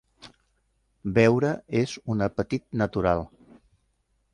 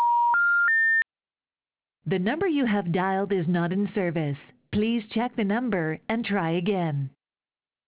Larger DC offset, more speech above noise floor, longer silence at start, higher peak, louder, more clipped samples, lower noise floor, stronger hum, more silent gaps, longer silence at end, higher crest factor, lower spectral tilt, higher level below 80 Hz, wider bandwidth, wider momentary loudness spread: neither; second, 47 dB vs over 64 dB; first, 0.25 s vs 0 s; first, -6 dBFS vs -14 dBFS; about the same, -25 LUFS vs -25 LUFS; neither; second, -71 dBFS vs under -90 dBFS; neither; neither; first, 1.05 s vs 0.8 s; first, 22 dB vs 12 dB; first, -7 dB/octave vs -5 dB/octave; first, -50 dBFS vs -60 dBFS; first, 11 kHz vs 4 kHz; about the same, 9 LU vs 11 LU